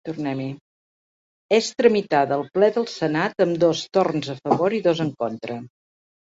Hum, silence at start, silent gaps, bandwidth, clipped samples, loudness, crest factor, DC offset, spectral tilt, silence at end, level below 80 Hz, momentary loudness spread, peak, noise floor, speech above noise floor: none; 0.05 s; 0.61-1.49 s; 8 kHz; under 0.1%; -22 LUFS; 20 dB; under 0.1%; -5.5 dB/octave; 0.7 s; -64 dBFS; 11 LU; -2 dBFS; under -90 dBFS; over 69 dB